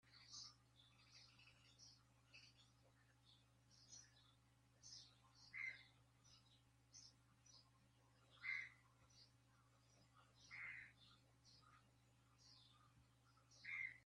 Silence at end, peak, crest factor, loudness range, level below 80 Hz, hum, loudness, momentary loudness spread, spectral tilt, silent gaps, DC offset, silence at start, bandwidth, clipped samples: 0 s; -38 dBFS; 26 dB; 11 LU; -86 dBFS; none; -56 LUFS; 19 LU; -1 dB/octave; none; under 0.1%; 0.05 s; 10.5 kHz; under 0.1%